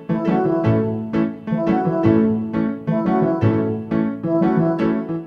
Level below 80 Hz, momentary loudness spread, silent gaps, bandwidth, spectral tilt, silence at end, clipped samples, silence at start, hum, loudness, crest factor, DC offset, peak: -48 dBFS; 5 LU; none; 5.8 kHz; -10.5 dB/octave; 0 s; under 0.1%; 0 s; none; -19 LUFS; 16 dB; under 0.1%; -2 dBFS